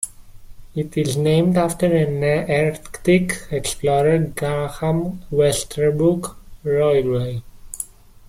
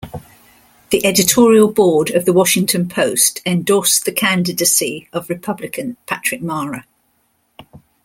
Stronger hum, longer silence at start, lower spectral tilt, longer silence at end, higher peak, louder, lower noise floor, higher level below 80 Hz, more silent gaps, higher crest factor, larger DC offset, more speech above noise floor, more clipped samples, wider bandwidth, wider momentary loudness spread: neither; about the same, 0 s vs 0 s; first, -6 dB/octave vs -3.5 dB/octave; first, 0.45 s vs 0.3 s; second, -4 dBFS vs 0 dBFS; second, -20 LUFS vs -15 LUFS; second, -38 dBFS vs -62 dBFS; first, -42 dBFS vs -52 dBFS; neither; about the same, 16 dB vs 16 dB; neither; second, 20 dB vs 47 dB; neither; about the same, 16 kHz vs 17 kHz; about the same, 14 LU vs 14 LU